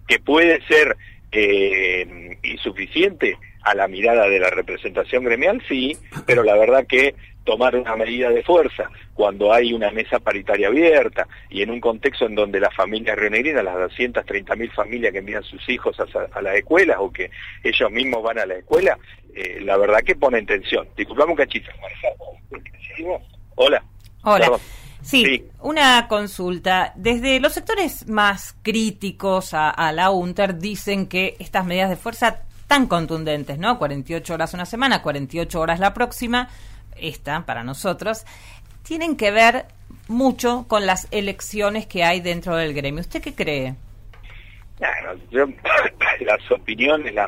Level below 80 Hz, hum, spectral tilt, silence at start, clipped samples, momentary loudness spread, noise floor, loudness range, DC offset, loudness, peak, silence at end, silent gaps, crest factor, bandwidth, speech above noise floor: -42 dBFS; none; -4 dB/octave; 0.1 s; under 0.1%; 13 LU; -40 dBFS; 5 LU; under 0.1%; -19 LUFS; -4 dBFS; 0 s; none; 16 dB; 16 kHz; 20 dB